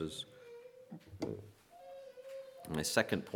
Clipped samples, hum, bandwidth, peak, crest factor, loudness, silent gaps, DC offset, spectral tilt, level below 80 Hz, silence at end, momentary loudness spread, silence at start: under 0.1%; none; 19 kHz; -14 dBFS; 28 dB; -39 LUFS; none; under 0.1%; -3.5 dB/octave; -66 dBFS; 0 s; 21 LU; 0 s